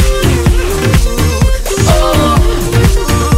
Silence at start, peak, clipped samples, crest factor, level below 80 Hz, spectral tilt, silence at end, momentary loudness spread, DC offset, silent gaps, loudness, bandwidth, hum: 0 s; 0 dBFS; under 0.1%; 10 dB; -12 dBFS; -5 dB/octave; 0 s; 3 LU; under 0.1%; none; -11 LUFS; 16.5 kHz; none